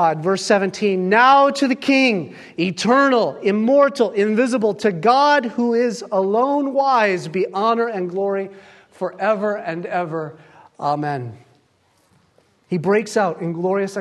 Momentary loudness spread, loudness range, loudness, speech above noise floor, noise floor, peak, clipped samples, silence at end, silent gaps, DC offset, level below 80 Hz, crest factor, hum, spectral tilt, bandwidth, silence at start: 11 LU; 9 LU; -18 LUFS; 43 dB; -60 dBFS; -2 dBFS; under 0.1%; 0 s; none; under 0.1%; -70 dBFS; 18 dB; none; -5.5 dB/octave; 12 kHz; 0 s